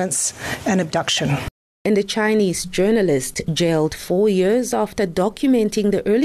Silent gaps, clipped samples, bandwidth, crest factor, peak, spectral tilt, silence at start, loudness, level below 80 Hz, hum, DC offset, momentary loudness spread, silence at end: 1.51-1.85 s; under 0.1%; 13.5 kHz; 10 dB; -8 dBFS; -4.5 dB/octave; 0 s; -19 LUFS; -44 dBFS; none; under 0.1%; 5 LU; 0 s